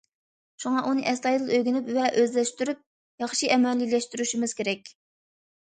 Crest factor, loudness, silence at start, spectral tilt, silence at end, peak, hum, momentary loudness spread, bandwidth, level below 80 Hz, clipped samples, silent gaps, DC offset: 20 dB; -26 LUFS; 0.6 s; -3 dB/octave; 0.75 s; -6 dBFS; none; 8 LU; 9.4 kHz; -76 dBFS; under 0.1%; 2.86-3.18 s; under 0.1%